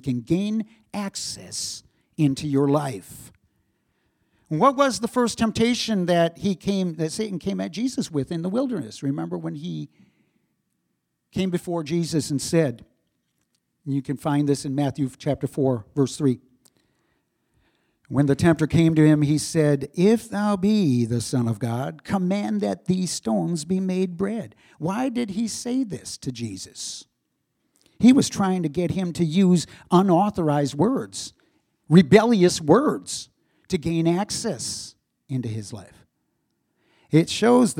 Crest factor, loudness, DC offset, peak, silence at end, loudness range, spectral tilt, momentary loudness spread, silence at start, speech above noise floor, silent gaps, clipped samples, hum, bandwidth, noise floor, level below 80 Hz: 22 dB; -23 LUFS; under 0.1%; 0 dBFS; 0 s; 8 LU; -6 dB/octave; 14 LU; 0.05 s; 54 dB; none; under 0.1%; none; 16 kHz; -76 dBFS; -56 dBFS